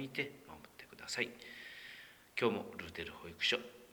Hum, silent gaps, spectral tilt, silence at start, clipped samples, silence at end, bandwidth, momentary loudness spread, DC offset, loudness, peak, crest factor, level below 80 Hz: none; none; -3 dB/octave; 0 s; under 0.1%; 0 s; over 20 kHz; 20 LU; under 0.1%; -40 LUFS; -18 dBFS; 24 dB; -72 dBFS